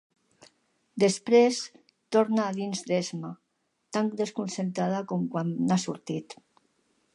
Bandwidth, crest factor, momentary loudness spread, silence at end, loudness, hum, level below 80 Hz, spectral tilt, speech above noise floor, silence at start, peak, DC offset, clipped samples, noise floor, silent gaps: 11.5 kHz; 20 dB; 15 LU; 0.8 s; -28 LUFS; none; -78 dBFS; -5.5 dB/octave; 44 dB; 0.95 s; -10 dBFS; under 0.1%; under 0.1%; -71 dBFS; none